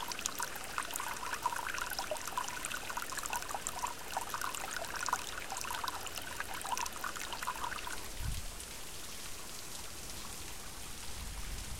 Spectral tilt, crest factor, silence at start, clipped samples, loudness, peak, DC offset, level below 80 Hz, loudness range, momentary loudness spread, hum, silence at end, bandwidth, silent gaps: -1.5 dB/octave; 28 dB; 0 s; under 0.1%; -40 LUFS; -12 dBFS; 0.4%; -52 dBFS; 5 LU; 7 LU; none; 0 s; 17 kHz; none